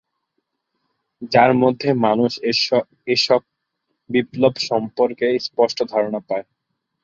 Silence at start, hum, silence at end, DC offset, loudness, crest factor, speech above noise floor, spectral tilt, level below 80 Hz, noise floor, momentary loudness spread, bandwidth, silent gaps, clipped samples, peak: 1.2 s; none; 0.6 s; under 0.1%; -19 LUFS; 20 dB; 58 dB; -5 dB/octave; -62 dBFS; -76 dBFS; 7 LU; 7.6 kHz; none; under 0.1%; 0 dBFS